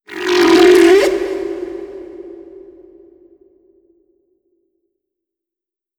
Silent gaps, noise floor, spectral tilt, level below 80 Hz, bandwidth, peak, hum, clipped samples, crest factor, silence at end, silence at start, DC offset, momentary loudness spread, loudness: none; -87 dBFS; -3.5 dB/octave; -52 dBFS; 18 kHz; 0 dBFS; none; under 0.1%; 16 dB; 3.5 s; 0.1 s; under 0.1%; 25 LU; -12 LUFS